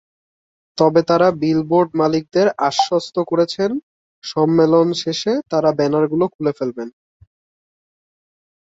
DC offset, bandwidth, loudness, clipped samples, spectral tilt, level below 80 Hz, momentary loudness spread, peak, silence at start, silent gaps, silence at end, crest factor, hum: under 0.1%; 8 kHz; -17 LUFS; under 0.1%; -6 dB/octave; -60 dBFS; 11 LU; -2 dBFS; 0.75 s; 3.83-4.22 s, 6.35-6.39 s; 1.75 s; 16 dB; none